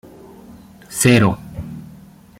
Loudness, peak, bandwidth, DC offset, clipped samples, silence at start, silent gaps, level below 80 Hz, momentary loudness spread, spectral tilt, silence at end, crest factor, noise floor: -16 LUFS; -2 dBFS; 16.5 kHz; under 0.1%; under 0.1%; 0.9 s; none; -46 dBFS; 21 LU; -5 dB/octave; 0.55 s; 18 dB; -43 dBFS